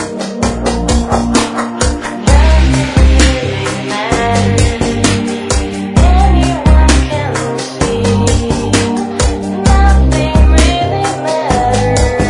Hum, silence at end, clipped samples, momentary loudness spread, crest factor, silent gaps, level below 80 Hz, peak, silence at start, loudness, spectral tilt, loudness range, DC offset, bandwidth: none; 0 s; 0.2%; 7 LU; 10 dB; none; -14 dBFS; 0 dBFS; 0 s; -12 LUFS; -5 dB/octave; 1 LU; under 0.1%; 11 kHz